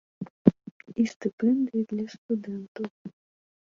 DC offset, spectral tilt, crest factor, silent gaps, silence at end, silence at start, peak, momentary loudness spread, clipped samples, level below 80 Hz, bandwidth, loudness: under 0.1%; -8 dB/octave; 26 dB; 0.30-0.45 s, 0.71-0.80 s, 1.16-1.20 s, 1.33-1.38 s, 2.18-2.29 s, 2.68-2.75 s, 2.90-3.05 s; 0.55 s; 0.2 s; -2 dBFS; 18 LU; under 0.1%; -64 dBFS; 7.4 kHz; -28 LUFS